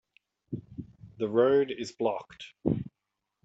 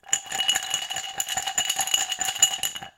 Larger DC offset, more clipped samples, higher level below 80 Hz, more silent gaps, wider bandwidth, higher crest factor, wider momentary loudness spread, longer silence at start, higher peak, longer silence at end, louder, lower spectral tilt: neither; neither; about the same, -60 dBFS vs -62 dBFS; neither; second, 8 kHz vs 17 kHz; about the same, 20 dB vs 24 dB; first, 22 LU vs 7 LU; first, 0.5 s vs 0.05 s; second, -10 dBFS vs -4 dBFS; first, 0.55 s vs 0.1 s; second, -29 LUFS vs -23 LUFS; first, -7 dB/octave vs 2.5 dB/octave